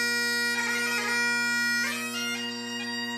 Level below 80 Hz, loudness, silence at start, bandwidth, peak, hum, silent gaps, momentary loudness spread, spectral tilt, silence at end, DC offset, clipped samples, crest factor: -82 dBFS; -26 LUFS; 0 s; 15.5 kHz; -16 dBFS; none; none; 7 LU; -1 dB/octave; 0 s; under 0.1%; under 0.1%; 12 dB